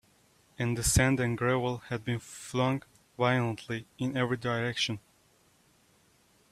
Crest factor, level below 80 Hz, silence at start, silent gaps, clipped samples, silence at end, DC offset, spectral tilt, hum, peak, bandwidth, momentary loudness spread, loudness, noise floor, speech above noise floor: 22 dB; -48 dBFS; 0.6 s; none; under 0.1%; 1.5 s; under 0.1%; -4.5 dB/octave; none; -10 dBFS; 15 kHz; 11 LU; -30 LUFS; -66 dBFS; 36 dB